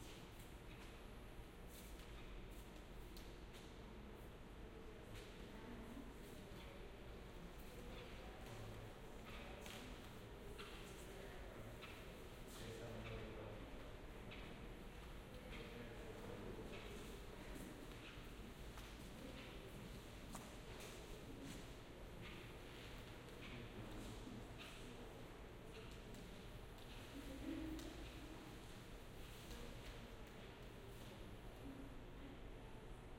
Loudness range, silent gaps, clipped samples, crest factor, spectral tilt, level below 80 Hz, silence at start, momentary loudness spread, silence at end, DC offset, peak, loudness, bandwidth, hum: 3 LU; none; under 0.1%; 18 dB; -5 dB/octave; -60 dBFS; 0 s; 5 LU; 0 s; under 0.1%; -36 dBFS; -56 LUFS; 16 kHz; none